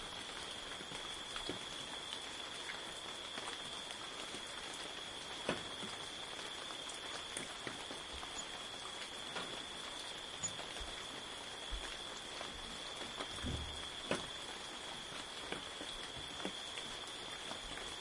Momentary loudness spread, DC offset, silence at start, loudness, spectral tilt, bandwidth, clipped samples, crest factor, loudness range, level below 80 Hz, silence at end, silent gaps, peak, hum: 3 LU; under 0.1%; 0 s; -44 LUFS; -2 dB/octave; 11.5 kHz; under 0.1%; 26 dB; 1 LU; -60 dBFS; 0 s; none; -20 dBFS; none